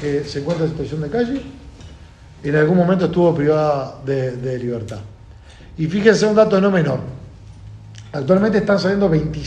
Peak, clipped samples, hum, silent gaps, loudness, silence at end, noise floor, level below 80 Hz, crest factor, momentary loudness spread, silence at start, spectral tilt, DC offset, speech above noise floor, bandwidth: 0 dBFS; under 0.1%; none; none; -18 LUFS; 0 s; -41 dBFS; -42 dBFS; 18 dB; 18 LU; 0 s; -7 dB/octave; under 0.1%; 24 dB; 9.2 kHz